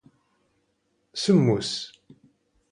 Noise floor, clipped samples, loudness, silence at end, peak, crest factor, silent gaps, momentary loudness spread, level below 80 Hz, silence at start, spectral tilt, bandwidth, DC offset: -72 dBFS; under 0.1%; -23 LUFS; 0.85 s; -8 dBFS; 20 dB; none; 17 LU; -64 dBFS; 1.15 s; -6 dB/octave; 11 kHz; under 0.1%